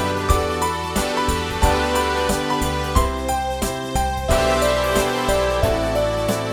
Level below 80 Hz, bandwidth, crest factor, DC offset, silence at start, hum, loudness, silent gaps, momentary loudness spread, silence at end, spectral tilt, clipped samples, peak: -28 dBFS; 19.5 kHz; 18 dB; under 0.1%; 0 s; none; -20 LUFS; none; 4 LU; 0 s; -4.5 dB/octave; under 0.1%; -2 dBFS